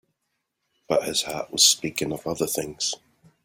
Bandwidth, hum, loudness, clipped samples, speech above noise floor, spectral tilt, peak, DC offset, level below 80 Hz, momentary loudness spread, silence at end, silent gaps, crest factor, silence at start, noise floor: 16.5 kHz; none; -23 LUFS; under 0.1%; 54 dB; -1.5 dB/octave; -4 dBFS; under 0.1%; -60 dBFS; 11 LU; 0.5 s; none; 24 dB; 0.9 s; -78 dBFS